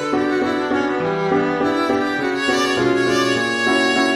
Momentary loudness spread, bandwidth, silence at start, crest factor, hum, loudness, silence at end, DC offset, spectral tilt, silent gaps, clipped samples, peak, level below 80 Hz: 3 LU; 13.5 kHz; 0 s; 14 dB; none; -18 LUFS; 0 s; under 0.1%; -4 dB/octave; none; under 0.1%; -4 dBFS; -52 dBFS